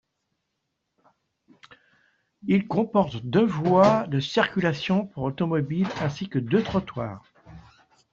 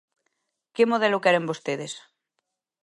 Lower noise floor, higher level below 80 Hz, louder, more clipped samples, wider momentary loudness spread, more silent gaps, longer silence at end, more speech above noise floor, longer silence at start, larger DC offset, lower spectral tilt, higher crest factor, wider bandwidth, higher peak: about the same, -79 dBFS vs -80 dBFS; first, -58 dBFS vs -78 dBFS; about the same, -24 LUFS vs -23 LUFS; neither; second, 12 LU vs 17 LU; neither; second, 0.5 s vs 0.85 s; about the same, 56 dB vs 57 dB; first, 2.45 s vs 0.8 s; neither; first, -7 dB/octave vs -4.5 dB/octave; about the same, 20 dB vs 20 dB; second, 7.4 kHz vs 11.5 kHz; about the same, -6 dBFS vs -6 dBFS